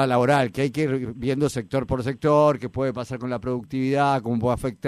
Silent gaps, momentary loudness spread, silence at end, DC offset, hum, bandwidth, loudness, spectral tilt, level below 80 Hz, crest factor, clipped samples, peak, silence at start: none; 9 LU; 0 s; under 0.1%; none; 14 kHz; -23 LUFS; -7 dB/octave; -48 dBFS; 16 dB; under 0.1%; -8 dBFS; 0 s